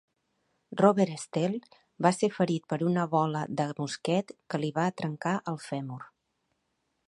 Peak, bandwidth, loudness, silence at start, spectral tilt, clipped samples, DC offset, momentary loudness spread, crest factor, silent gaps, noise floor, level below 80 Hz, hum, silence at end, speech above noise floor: -6 dBFS; 11.5 kHz; -29 LUFS; 0.7 s; -6.5 dB/octave; under 0.1%; under 0.1%; 11 LU; 24 dB; none; -78 dBFS; -74 dBFS; none; 1 s; 50 dB